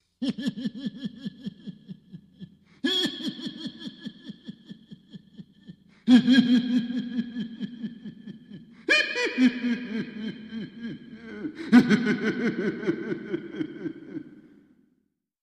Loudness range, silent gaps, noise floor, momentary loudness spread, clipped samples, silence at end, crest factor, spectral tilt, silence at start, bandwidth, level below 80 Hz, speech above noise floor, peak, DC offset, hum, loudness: 8 LU; none; -73 dBFS; 24 LU; under 0.1%; 1 s; 22 dB; -5.5 dB/octave; 0.2 s; 10 kHz; -68 dBFS; 48 dB; -4 dBFS; under 0.1%; none; -26 LUFS